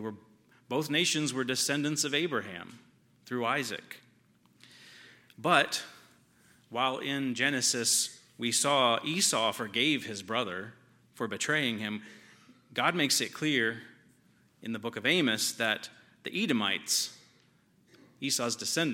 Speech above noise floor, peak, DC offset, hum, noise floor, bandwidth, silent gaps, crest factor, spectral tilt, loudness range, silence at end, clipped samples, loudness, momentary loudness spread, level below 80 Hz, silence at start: 35 dB; -8 dBFS; under 0.1%; none; -66 dBFS; 17 kHz; none; 24 dB; -2.5 dB/octave; 5 LU; 0 s; under 0.1%; -29 LUFS; 15 LU; -82 dBFS; 0 s